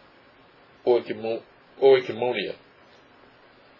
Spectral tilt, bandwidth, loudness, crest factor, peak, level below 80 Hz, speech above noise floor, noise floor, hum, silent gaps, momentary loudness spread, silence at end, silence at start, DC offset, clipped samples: -7 dB/octave; 6 kHz; -24 LUFS; 20 dB; -6 dBFS; -76 dBFS; 32 dB; -55 dBFS; none; none; 15 LU; 1.25 s; 0.85 s; under 0.1%; under 0.1%